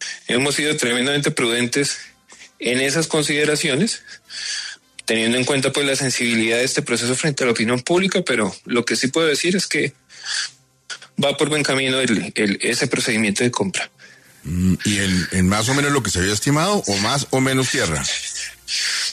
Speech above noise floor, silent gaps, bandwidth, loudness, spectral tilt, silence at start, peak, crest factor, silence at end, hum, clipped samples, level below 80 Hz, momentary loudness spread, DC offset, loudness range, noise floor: 26 dB; none; 14 kHz; -19 LUFS; -3.5 dB/octave; 0 s; -6 dBFS; 14 dB; 0 s; none; under 0.1%; -52 dBFS; 8 LU; under 0.1%; 2 LU; -45 dBFS